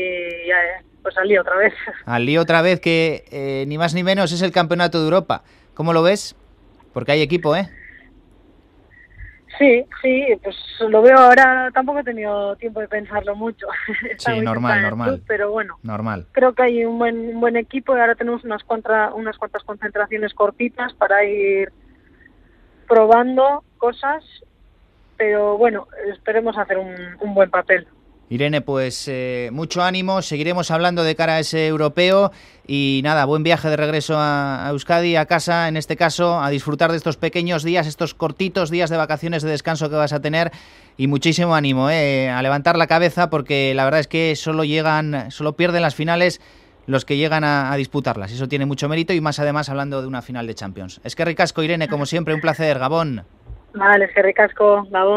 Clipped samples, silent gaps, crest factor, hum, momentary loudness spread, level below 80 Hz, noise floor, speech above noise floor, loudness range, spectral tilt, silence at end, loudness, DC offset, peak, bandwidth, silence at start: under 0.1%; none; 18 dB; none; 11 LU; -52 dBFS; -52 dBFS; 35 dB; 6 LU; -5.5 dB/octave; 0 s; -18 LUFS; under 0.1%; 0 dBFS; 14 kHz; 0 s